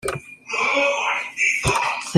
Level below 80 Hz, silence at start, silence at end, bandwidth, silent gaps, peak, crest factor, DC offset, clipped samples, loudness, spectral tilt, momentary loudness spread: -44 dBFS; 0.05 s; 0 s; 16 kHz; none; -2 dBFS; 20 dB; under 0.1%; under 0.1%; -20 LUFS; -3.5 dB/octave; 10 LU